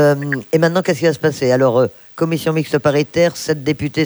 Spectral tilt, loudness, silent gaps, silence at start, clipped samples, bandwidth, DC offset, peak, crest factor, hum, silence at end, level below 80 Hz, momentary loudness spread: -6 dB/octave; -16 LUFS; none; 0 s; under 0.1%; over 20 kHz; under 0.1%; -2 dBFS; 14 dB; none; 0 s; -52 dBFS; 5 LU